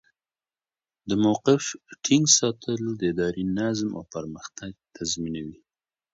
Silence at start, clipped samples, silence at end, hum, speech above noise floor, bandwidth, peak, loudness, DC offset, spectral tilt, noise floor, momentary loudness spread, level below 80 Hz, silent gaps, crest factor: 1.05 s; under 0.1%; 0.6 s; none; over 65 dB; 8 kHz; -4 dBFS; -24 LUFS; under 0.1%; -3.5 dB/octave; under -90 dBFS; 19 LU; -58 dBFS; none; 22 dB